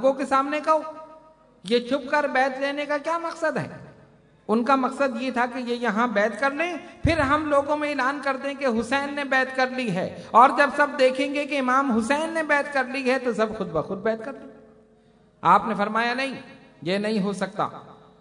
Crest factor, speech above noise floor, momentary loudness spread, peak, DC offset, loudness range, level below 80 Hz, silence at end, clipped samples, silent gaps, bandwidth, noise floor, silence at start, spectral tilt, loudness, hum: 20 dB; 34 dB; 9 LU; -4 dBFS; under 0.1%; 5 LU; -52 dBFS; 0.25 s; under 0.1%; none; 11 kHz; -57 dBFS; 0 s; -5 dB/octave; -23 LUFS; none